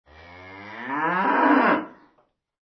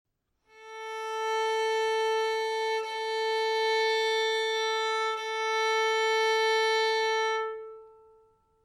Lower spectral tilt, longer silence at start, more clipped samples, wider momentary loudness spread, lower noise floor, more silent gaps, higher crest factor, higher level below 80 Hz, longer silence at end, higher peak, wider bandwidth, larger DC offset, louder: first, -7.5 dB/octave vs 2 dB/octave; second, 0.3 s vs 0.55 s; neither; first, 23 LU vs 10 LU; about the same, -66 dBFS vs -66 dBFS; neither; about the same, 18 dB vs 14 dB; first, -66 dBFS vs -78 dBFS; about the same, 0.8 s vs 0.75 s; first, -6 dBFS vs -16 dBFS; second, 6 kHz vs 13.5 kHz; neither; first, -21 LUFS vs -27 LUFS